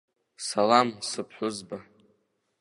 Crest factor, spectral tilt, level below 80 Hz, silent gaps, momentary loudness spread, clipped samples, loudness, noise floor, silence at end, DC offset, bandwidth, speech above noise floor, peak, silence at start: 24 dB; -3.5 dB/octave; -74 dBFS; none; 18 LU; under 0.1%; -27 LUFS; -72 dBFS; 0.8 s; under 0.1%; 11.5 kHz; 45 dB; -6 dBFS; 0.4 s